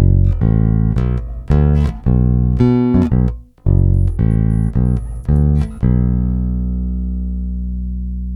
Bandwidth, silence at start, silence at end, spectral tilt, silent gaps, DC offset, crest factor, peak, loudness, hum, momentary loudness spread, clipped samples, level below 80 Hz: 4.9 kHz; 0 s; 0 s; -11 dB/octave; none; under 0.1%; 14 dB; 0 dBFS; -16 LUFS; 60 Hz at -30 dBFS; 9 LU; under 0.1%; -18 dBFS